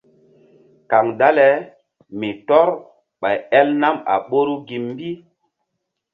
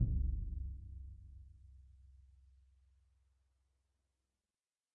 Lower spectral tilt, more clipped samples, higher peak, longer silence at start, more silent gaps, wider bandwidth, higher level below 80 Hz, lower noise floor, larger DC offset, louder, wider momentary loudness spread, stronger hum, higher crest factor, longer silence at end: second, -8 dB/octave vs -17 dB/octave; neither; first, 0 dBFS vs -22 dBFS; first, 0.9 s vs 0 s; neither; first, 5 kHz vs 0.8 kHz; second, -66 dBFS vs -46 dBFS; second, -77 dBFS vs under -90 dBFS; neither; first, -18 LUFS vs -44 LUFS; second, 15 LU vs 25 LU; neither; about the same, 20 dB vs 22 dB; second, 1 s vs 2.7 s